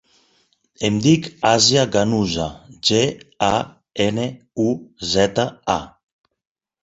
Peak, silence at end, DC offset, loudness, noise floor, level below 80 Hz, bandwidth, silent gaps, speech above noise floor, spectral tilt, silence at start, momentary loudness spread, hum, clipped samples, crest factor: -2 dBFS; 0.95 s; under 0.1%; -19 LUFS; -62 dBFS; -48 dBFS; 8.2 kHz; none; 43 dB; -4 dB/octave; 0.8 s; 11 LU; none; under 0.1%; 20 dB